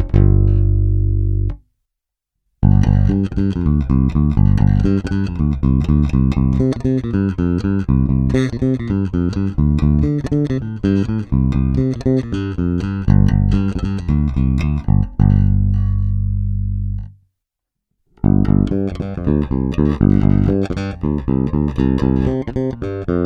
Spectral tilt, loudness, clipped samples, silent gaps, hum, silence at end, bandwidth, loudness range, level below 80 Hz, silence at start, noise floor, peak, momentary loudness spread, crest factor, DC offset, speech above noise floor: -9.5 dB/octave; -17 LUFS; under 0.1%; none; none; 0 s; 6.8 kHz; 3 LU; -22 dBFS; 0 s; -81 dBFS; 0 dBFS; 7 LU; 16 dB; under 0.1%; 65 dB